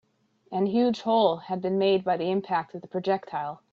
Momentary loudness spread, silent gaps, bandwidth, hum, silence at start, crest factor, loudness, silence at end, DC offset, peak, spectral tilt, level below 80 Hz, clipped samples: 10 LU; none; 7.2 kHz; none; 0.5 s; 18 dB; -26 LUFS; 0.15 s; under 0.1%; -8 dBFS; -7 dB/octave; -72 dBFS; under 0.1%